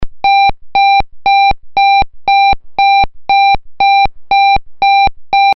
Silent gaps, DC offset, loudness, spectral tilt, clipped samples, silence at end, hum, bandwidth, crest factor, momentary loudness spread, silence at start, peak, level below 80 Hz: none; under 0.1%; -10 LUFS; 1 dB/octave; under 0.1%; 0 s; none; 5.8 kHz; 6 dB; 2 LU; 0 s; -4 dBFS; -30 dBFS